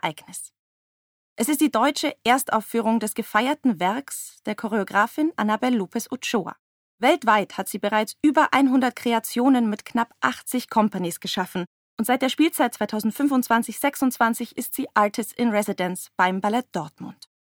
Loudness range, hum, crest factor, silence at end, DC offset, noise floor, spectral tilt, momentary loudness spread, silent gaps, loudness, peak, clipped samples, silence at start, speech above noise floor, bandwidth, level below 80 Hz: 3 LU; none; 20 dB; 0.5 s; under 0.1%; under -90 dBFS; -4 dB/octave; 10 LU; 0.59-1.36 s, 6.59-6.98 s, 11.67-11.97 s; -23 LUFS; -4 dBFS; under 0.1%; 0.05 s; over 67 dB; over 20 kHz; -70 dBFS